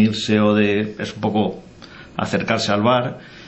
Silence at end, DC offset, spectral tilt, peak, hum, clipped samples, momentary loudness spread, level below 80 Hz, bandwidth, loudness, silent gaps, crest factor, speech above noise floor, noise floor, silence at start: 0 s; under 0.1%; -5.5 dB/octave; -4 dBFS; none; under 0.1%; 11 LU; -52 dBFS; 8.4 kHz; -19 LUFS; none; 16 dB; 22 dB; -41 dBFS; 0 s